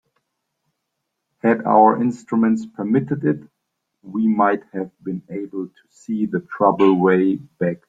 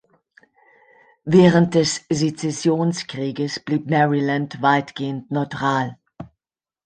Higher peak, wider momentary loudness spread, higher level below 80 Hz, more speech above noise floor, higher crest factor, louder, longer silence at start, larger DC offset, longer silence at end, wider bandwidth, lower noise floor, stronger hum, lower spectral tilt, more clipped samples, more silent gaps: about the same, -2 dBFS vs -2 dBFS; first, 15 LU vs 12 LU; second, -64 dBFS vs -58 dBFS; second, 59 dB vs over 71 dB; about the same, 18 dB vs 18 dB; about the same, -19 LUFS vs -20 LUFS; first, 1.45 s vs 1.25 s; neither; second, 0.15 s vs 0.6 s; second, 7.8 kHz vs 9.4 kHz; second, -77 dBFS vs under -90 dBFS; neither; first, -8.5 dB/octave vs -5.5 dB/octave; neither; neither